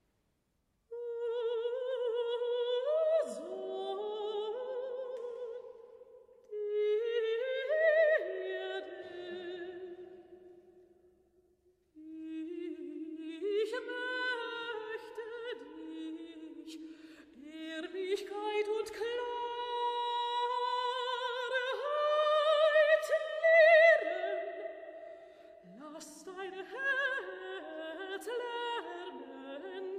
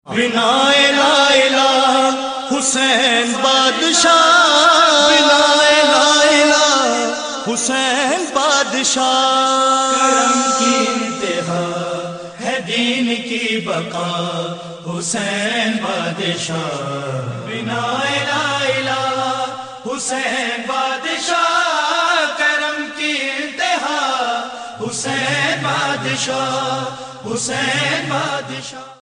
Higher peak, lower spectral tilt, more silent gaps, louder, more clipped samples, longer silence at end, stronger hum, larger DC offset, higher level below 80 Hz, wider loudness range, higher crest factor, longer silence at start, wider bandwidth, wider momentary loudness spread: second, -14 dBFS vs -2 dBFS; about the same, -2 dB/octave vs -2 dB/octave; neither; second, -33 LUFS vs -15 LUFS; neither; about the same, 0 s vs 0.1 s; neither; neither; second, -82 dBFS vs -58 dBFS; first, 17 LU vs 9 LU; first, 22 dB vs 16 dB; first, 0.9 s vs 0.05 s; first, 12.5 kHz vs 10.5 kHz; first, 20 LU vs 13 LU